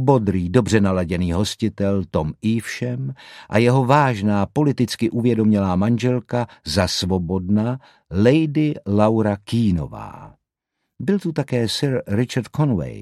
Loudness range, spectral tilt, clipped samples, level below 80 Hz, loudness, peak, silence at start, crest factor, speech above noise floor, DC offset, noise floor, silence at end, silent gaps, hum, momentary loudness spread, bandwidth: 4 LU; -6.5 dB/octave; under 0.1%; -44 dBFS; -20 LUFS; 0 dBFS; 0 s; 18 dB; 59 dB; under 0.1%; -78 dBFS; 0 s; none; none; 9 LU; 14 kHz